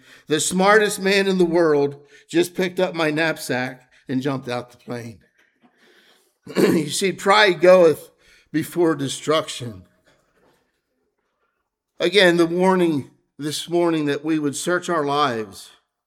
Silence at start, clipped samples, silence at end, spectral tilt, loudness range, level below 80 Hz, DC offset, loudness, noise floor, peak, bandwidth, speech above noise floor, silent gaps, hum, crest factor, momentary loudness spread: 0.3 s; under 0.1%; 0.4 s; -4.5 dB/octave; 8 LU; -64 dBFS; under 0.1%; -19 LUFS; -75 dBFS; 0 dBFS; 16.5 kHz; 56 dB; none; none; 20 dB; 15 LU